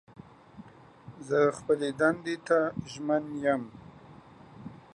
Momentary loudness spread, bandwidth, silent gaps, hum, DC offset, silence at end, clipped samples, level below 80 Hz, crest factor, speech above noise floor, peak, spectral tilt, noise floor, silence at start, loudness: 23 LU; 10.5 kHz; none; none; under 0.1%; 0.2 s; under 0.1%; -66 dBFS; 20 dB; 24 dB; -10 dBFS; -6 dB/octave; -52 dBFS; 0.55 s; -29 LUFS